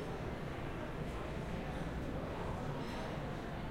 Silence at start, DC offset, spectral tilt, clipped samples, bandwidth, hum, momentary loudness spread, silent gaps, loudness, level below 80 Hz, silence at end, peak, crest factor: 0 s; under 0.1%; -6.5 dB/octave; under 0.1%; 16.5 kHz; none; 2 LU; none; -43 LUFS; -48 dBFS; 0 s; -28 dBFS; 14 dB